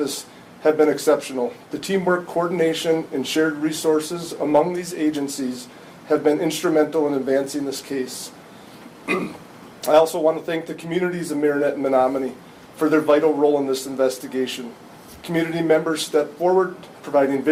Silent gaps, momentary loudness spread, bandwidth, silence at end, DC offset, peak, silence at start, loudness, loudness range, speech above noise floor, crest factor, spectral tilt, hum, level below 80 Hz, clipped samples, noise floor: none; 13 LU; 16 kHz; 0 s; under 0.1%; -4 dBFS; 0 s; -21 LUFS; 3 LU; 22 dB; 18 dB; -4.5 dB/octave; none; -64 dBFS; under 0.1%; -42 dBFS